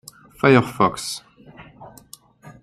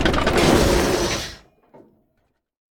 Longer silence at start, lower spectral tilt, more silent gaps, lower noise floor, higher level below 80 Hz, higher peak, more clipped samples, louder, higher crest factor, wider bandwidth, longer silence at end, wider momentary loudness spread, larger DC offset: first, 0.45 s vs 0 s; about the same, -5.5 dB/octave vs -4.5 dB/octave; neither; second, -47 dBFS vs -69 dBFS; second, -56 dBFS vs -30 dBFS; about the same, -2 dBFS vs -4 dBFS; neither; about the same, -19 LUFS vs -18 LUFS; about the same, 20 dB vs 18 dB; second, 15 kHz vs 18 kHz; second, 0.1 s vs 1.4 s; first, 17 LU vs 10 LU; neither